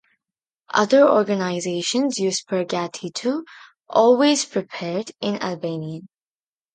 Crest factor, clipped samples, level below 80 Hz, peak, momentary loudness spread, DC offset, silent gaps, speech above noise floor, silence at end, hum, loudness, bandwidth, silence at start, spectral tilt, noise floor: 20 dB; under 0.1%; -72 dBFS; -2 dBFS; 13 LU; under 0.1%; none; over 70 dB; 0.7 s; none; -21 LUFS; 9.6 kHz; 0.75 s; -4 dB/octave; under -90 dBFS